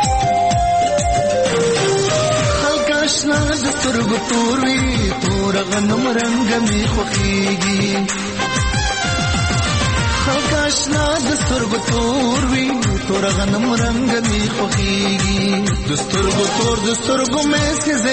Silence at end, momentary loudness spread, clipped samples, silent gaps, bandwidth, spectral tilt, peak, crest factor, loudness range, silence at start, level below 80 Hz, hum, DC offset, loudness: 0 s; 2 LU; under 0.1%; none; 8.8 kHz; -4 dB/octave; -4 dBFS; 12 dB; 1 LU; 0 s; -28 dBFS; none; 0.3%; -16 LUFS